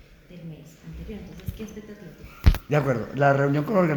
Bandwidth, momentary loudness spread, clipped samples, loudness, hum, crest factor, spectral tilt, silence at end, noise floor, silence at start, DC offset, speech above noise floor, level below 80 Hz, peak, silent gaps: over 20 kHz; 22 LU; under 0.1%; -23 LUFS; none; 22 dB; -8 dB/octave; 0 s; -43 dBFS; 0.3 s; under 0.1%; 19 dB; -32 dBFS; -4 dBFS; none